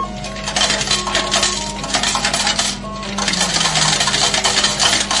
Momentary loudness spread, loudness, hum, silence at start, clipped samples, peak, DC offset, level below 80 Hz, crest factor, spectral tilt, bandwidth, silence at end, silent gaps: 8 LU; -15 LUFS; 50 Hz at -30 dBFS; 0 s; under 0.1%; -2 dBFS; under 0.1%; -36 dBFS; 16 dB; -1 dB/octave; 11.5 kHz; 0 s; none